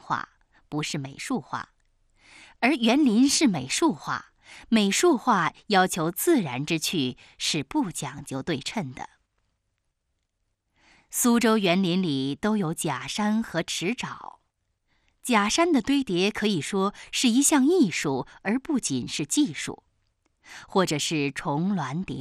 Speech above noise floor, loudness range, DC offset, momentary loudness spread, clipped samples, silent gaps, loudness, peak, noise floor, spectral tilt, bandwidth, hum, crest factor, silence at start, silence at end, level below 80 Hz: 53 dB; 6 LU; under 0.1%; 13 LU; under 0.1%; none; -25 LUFS; -8 dBFS; -77 dBFS; -4 dB/octave; 13.5 kHz; none; 18 dB; 0.05 s; 0 s; -60 dBFS